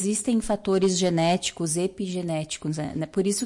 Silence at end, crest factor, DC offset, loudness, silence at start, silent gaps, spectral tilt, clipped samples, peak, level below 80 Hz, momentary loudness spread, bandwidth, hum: 0 s; 12 dB; under 0.1%; -25 LUFS; 0 s; none; -4.5 dB/octave; under 0.1%; -14 dBFS; -52 dBFS; 8 LU; 11.5 kHz; none